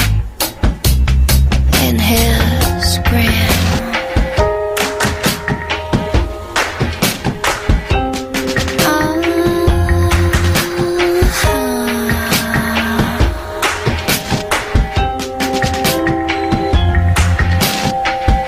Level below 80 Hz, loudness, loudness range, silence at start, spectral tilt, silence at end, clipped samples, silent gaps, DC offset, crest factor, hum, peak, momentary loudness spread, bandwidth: -20 dBFS; -14 LUFS; 3 LU; 0 s; -4.5 dB/octave; 0 s; under 0.1%; none; under 0.1%; 14 dB; none; 0 dBFS; 5 LU; 16 kHz